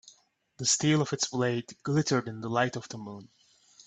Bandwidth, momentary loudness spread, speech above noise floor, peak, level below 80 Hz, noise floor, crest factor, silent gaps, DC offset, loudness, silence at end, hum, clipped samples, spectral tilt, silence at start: 9.4 kHz; 16 LU; 35 dB; -12 dBFS; -68 dBFS; -64 dBFS; 20 dB; none; under 0.1%; -28 LUFS; 0.6 s; none; under 0.1%; -4 dB/octave; 0.05 s